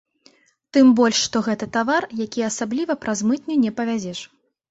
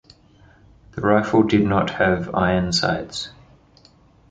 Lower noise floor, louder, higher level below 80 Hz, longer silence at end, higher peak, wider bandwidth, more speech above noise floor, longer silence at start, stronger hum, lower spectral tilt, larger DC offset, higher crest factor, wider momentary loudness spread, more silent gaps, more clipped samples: first, -57 dBFS vs -53 dBFS; about the same, -20 LUFS vs -20 LUFS; second, -62 dBFS vs -44 dBFS; second, 0.45 s vs 1 s; about the same, -4 dBFS vs -2 dBFS; second, 8 kHz vs 9.4 kHz; about the same, 37 dB vs 34 dB; second, 0.75 s vs 0.95 s; neither; second, -3.5 dB/octave vs -5.5 dB/octave; neither; about the same, 16 dB vs 20 dB; about the same, 11 LU vs 13 LU; neither; neither